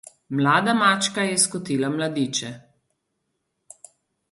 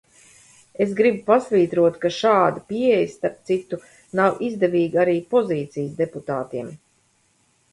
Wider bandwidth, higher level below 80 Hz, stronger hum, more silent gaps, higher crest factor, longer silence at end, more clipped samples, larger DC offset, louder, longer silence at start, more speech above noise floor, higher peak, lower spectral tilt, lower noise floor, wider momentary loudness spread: about the same, 11.5 kHz vs 11.5 kHz; about the same, -68 dBFS vs -64 dBFS; neither; neither; about the same, 20 dB vs 18 dB; first, 1.7 s vs 0.95 s; neither; neither; about the same, -21 LUFS vs -21 LUFS; second, 0.3 s vs 0.8 s; first, 54 dB vs 43 dB; about the same, -4 dBFS vs -4 dBFS; second, -3.5 dB/octave vs -6.5 dB/octave; first, -76 dBFS vs -63 dBFS; about the same, 9 LU vs 11 LU